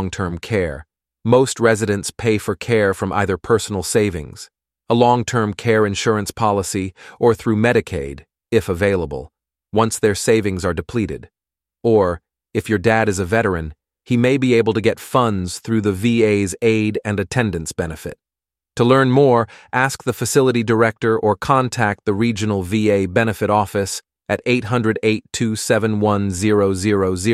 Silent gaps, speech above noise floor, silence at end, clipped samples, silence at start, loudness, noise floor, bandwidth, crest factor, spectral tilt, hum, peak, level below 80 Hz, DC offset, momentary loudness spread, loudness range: none; 72 dB; 0 s; under 0.1%; 0 s; -18 LUFS; -89 dBFS; 15 kHz; 16 dB; -5.5 dB/octave; none; -2 dBFS; -44 dBFS; under 0.1%; 10 LU; 3 LU